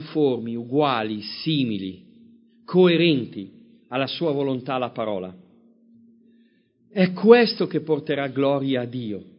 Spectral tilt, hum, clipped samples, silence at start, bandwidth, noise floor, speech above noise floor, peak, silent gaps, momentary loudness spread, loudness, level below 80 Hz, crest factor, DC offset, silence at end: -10.5 dB/octave; none; under 0.1%; 0 s; 5.4 kHz; -61 dBFS; 39 dB; 0 dBFS; none; 16 LU; -22 LUFS; -66 dBFS; 22 dB; under 0.1%; 0.15 s